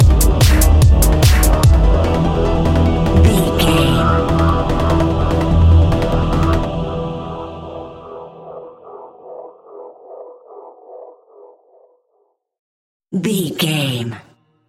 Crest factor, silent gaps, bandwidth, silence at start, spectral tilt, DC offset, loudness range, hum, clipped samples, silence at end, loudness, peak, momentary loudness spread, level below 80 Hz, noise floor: 14 dB; 12.59-13.00 s; 16.5 kHz; 0 s; -6 dB/octave; under 0.1%; 21 LU; none; under 0.1%; 0.5 s; -14 LUFS; 0 dBFS; 23 LU; -18 dBFS; -63 dBFS